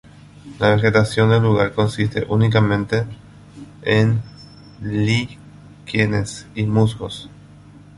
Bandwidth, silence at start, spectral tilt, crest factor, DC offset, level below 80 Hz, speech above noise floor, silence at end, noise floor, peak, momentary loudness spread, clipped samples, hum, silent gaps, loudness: 11.5 kHz; 0.45 s; -6.5 dB/octave; 18 dB; under 0.1%; -44 dBFS; 26 dB; 0.7 s; -43 dBFS; -2 dBFS; 15 LU; under 0.1%; 50 Hz at -40 dBFS; none; -19 LUFS